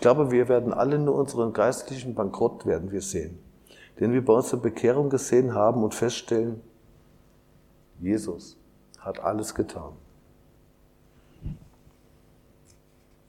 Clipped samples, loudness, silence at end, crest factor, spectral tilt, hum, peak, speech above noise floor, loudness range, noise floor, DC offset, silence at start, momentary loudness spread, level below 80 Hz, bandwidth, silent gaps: under 0.1%; -25 LUFS; 1.75 s; 22 dB; -6 dB/octave; none; -6 dBFS; 35 dB; 11 LU; -59 dBFS; under 0.1%; 0 s; 19 LU; -54 dBFS; 16 kHz; none